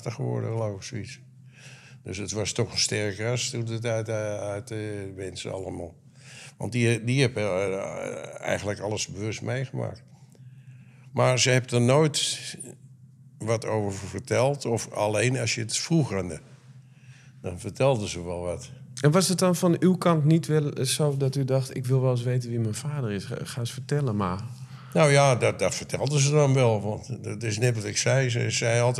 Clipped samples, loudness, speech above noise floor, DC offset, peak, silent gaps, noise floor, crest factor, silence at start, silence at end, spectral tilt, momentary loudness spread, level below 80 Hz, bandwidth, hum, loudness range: under 0.1%; -26 LUFS; 25 dB; under 0.1%; -6 dBFS; none; -51 dBFS; 20 dB; 0 s; 0 s; -5 dB/octave; 15 LU; -66 dBFS; 14 kHz; none; 7 LU